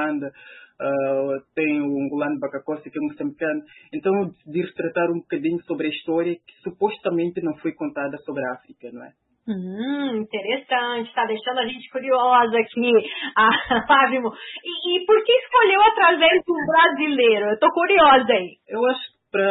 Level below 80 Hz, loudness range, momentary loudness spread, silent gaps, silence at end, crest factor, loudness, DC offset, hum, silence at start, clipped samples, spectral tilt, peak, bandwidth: -60 dBFS; 11 LU; 14 LU; none; 0 s; 18 dB; -20 LUFS; under 0.1%; none; 0 s; under 0.1%; -9.5 dB/octave; -4 dBFS; 4.1 kHz